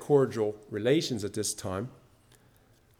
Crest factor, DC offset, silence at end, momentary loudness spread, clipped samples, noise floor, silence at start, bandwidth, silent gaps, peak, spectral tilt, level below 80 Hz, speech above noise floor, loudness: 18 dB; under 0.1%; 1.05 s; 11 LU; under 0.1%; -62 dBFS; 0 s; 16.5 kHz; none; -12 dBFS; -5 dB/octave; -66 dBFS; 34 dB; -30 LUFS